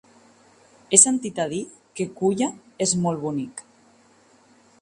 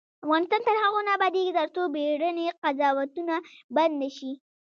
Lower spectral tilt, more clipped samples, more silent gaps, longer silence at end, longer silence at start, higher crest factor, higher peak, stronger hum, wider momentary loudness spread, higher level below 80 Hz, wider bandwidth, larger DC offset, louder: about the same, -3.5 dB/octave vs -3.5 dB/octave; neither; second, none vs 2.58-2.62 s, 3.64-3.69 s; first, 1.2 s vs 0.3 s; first, 0.9 s vs 0.25 s; first, 26 dB vs 16 dB; first, 0 dBFS vs -10 dBFS; neither; first, 18 LU vs 8 LU; first, -66 dBFS vs -86 dBFS; first, 11.5 kHz vs 7 kHz; neither; first, -21 LUFS vs -26 LUFS